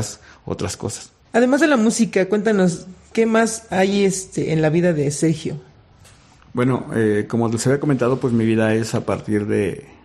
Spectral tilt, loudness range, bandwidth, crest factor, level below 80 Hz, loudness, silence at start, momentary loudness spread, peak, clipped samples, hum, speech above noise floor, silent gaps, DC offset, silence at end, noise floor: -5.5 dB/octave; 3 LU; 13.5 kHz; 16 dB; -54 dBFS; -19 LUFS; 0 s; 11 LU; -2 dBFS; under 0.1%; none; 30 dB; none; under 0.1%; 0.2 s; -48 dBFS